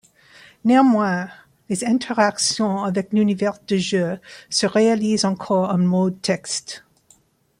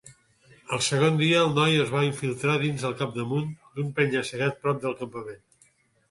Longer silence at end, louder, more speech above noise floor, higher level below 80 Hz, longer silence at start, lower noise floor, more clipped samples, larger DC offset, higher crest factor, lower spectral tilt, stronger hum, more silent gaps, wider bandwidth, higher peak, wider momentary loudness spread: about the same, 0.8 s vs 0.75 s; first, -20 LUFS vs -25 LUFS; about the same, 38 dB vs 38 dB; about the same, -64 dBFS vs -64 dBFS; first, 0.65 s vs 0.05 s; second, -57 dBFS vs -63 dBFS; neither; neither; about the same, 18 dB vs 18 dB; about the same, -4.5 dB/octave vs -5 dB/octave; neither; neither; about the same, 12 kHz vs 11.5 kHz; first, -4 dBFS vs -8 dBFS; second, 10 LU vs 13 LU